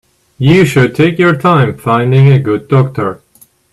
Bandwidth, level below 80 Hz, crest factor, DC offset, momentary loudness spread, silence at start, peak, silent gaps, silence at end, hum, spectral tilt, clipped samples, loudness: 12.5 kHz; -44 dBFS; 10 dB; under 0.1%; 7 LU; 0.4 s; 0 dBFS; none; 0.55 s; none; -7.5 dB/octave; under 0.1%; -10 LUFS